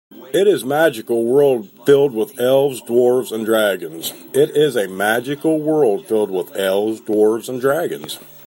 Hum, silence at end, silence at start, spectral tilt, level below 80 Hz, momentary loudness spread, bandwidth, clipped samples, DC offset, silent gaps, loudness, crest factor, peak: none; 0.05 s; 0.15 s; -5 dB/octave; -66 dBFS; 7 LU; 16.5 kHz; under 0.1%; under 0.1%; none; -17 LUFS; 16 dB; -2 dBFS